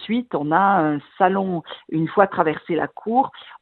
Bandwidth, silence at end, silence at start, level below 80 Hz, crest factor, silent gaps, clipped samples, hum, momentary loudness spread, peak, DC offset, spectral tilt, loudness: 4.4 kHz; 0.05 s; 0 s; -64 dBFS; 20 dB; none; under 0.1%; none; 9 LU; 0 dBFS; under 0.1%; -10.5 dB/octave; -21 LUFS